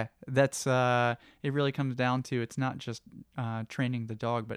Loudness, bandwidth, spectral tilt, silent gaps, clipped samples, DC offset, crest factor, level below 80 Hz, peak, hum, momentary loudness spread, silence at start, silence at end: -31 LUFS; 14.5 kHz; -5.5 dB/octave; none; under 0.1%; under 0.1%; 18 dB; -70 dBFS; -12 dBFS; none; 11 LU; 0 s; 0 s